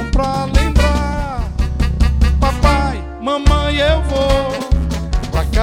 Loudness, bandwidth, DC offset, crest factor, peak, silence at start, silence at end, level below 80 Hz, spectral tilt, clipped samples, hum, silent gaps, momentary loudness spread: -16 LUFS; 12.5 kHz; under 0.1%; 14 dB; 0 dBFS; 0 s; 0 s; -16 dBFS; -6 dB/octave; under 0.1%; none; none; 7 LU